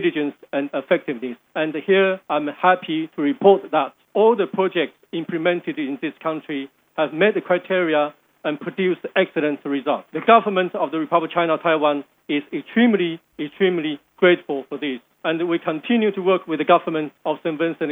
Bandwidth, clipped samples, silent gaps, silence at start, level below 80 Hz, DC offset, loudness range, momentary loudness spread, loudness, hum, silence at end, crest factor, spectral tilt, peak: 3.9 kHz; under 0.1%; none; 0 s; -78 dBFS; under 0.1%; 3 LU; 10 LU; -21 LUFS; none; 0 s; 20 dB; -8 dB/octave; 0 dBFS